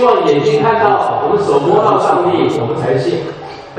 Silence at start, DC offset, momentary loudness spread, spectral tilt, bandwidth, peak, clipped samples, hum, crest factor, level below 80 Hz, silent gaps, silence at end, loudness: 0 s; under 0.1%; 7 LU; -6.5 dB/octave; 9.6 kHz; 0 dBFS; under 0.1%; none; 12 dB; -52 dBFS; none; 0 s; -13 LUFS